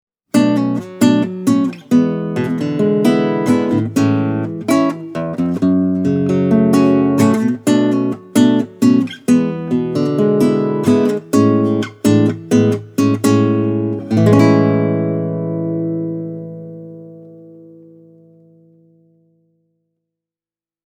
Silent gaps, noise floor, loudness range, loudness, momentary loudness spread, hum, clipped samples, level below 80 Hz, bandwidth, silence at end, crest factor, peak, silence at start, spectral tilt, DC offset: none; under -90 dBFS; 7 LU; -15 LUFS; 8 LU; none; under 0.1%; -58 dBFS; 16 kHz; 3.4 s; 14 dB; 0 dBFS; 0.35 s; -7 dB/octave; under 0.1%